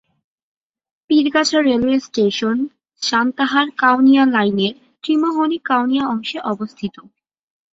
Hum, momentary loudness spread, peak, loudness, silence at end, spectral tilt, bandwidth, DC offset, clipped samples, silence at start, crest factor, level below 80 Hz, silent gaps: none; 11 LU; -2 dBFS; -17 LUFS; 0.7 s; -4.5 dB/octave; 7.8 kHz; under 0.1%; under 0.1%; 1.1 s; 16 dB; -58 dBFS; none